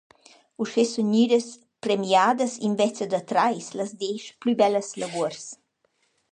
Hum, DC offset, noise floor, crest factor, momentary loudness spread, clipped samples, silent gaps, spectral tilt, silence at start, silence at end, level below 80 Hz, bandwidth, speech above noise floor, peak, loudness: none; under 0.1%; -70 dBFS; 18 dB; 12 LU; under 0.1%; none; -4.5 dB/octave; 0.6 s; 0.8 s; -76 dBFS; 10 kHz; 46 dB; -6 dBFS; -24 LUFS